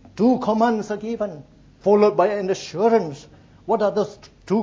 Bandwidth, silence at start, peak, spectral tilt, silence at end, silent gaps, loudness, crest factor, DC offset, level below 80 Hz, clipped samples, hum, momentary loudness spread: 7.6 kHz; 0.15 s; -4 dBFS; -6.5 dB/octave; 0 s; none; -21 LUFS; 18 dB; under 0.1%; -56 dBFS; under 0.1%; none; 13 LU